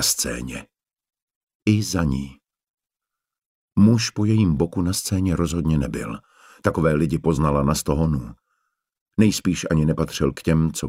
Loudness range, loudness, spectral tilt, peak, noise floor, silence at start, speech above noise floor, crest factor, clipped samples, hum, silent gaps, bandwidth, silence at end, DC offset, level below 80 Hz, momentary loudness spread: 4 LU; -21 LUFS; -5.5 dB/octave; -4 dBFS; -87 dBFS; 0 s; 66 dB; 18 dB; under 0.1%; none; 1.22-1.28 s, 1.35-1.47 s, 1.55-1.60 s, 2.70-2.78 s, 3.45-3.68 s, 9.01-9.06 s; 16 kHz; 0 s; under 0.1%; -38 dBFS; 10 LU